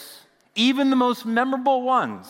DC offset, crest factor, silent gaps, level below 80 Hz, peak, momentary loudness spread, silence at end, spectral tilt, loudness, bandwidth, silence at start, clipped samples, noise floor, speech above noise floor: under 0.1%; 16 dB; none; -80 dBFS; -6 dBFS; 3 LU; 0 s; -4 dB/octave; -21 LUFS; 16.5 kHz; 0 s; under 0.1%; -48 dBFS; 28 dB